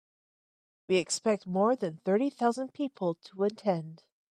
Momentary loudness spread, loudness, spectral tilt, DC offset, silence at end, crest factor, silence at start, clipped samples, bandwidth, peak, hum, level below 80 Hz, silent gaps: 7 LU; -30 LUFS; -5 dB/octave; under 0.1%; 0.35 s; 18 dB; 0.9 s; under 0.1%; 12 kHz; -14 dBFS; none; -80 dBFS; none